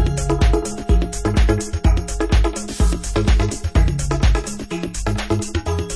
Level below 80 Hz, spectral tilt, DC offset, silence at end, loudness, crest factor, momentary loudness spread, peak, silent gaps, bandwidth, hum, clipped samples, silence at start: -20 dBFS; -5.5 dB/octave; under 0.1%; 0 s; -20 LUFS; 14 dB; 6 LU; -4 dBFS; none; 11 kHz; none; under 0.1%; 0 s